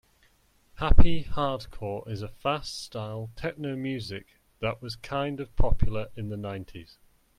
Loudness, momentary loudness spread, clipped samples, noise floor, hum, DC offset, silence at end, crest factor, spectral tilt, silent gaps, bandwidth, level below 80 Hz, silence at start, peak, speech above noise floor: -32 LUFS; 11 LU; under 0.1%; -64 dBFS; none; under 0.1%; 0.55 s; 22 dB; -6.5 dB/octave; none; 10 kHz; -32 dBFS; 0.8 s; -2 dBFS; 40 dB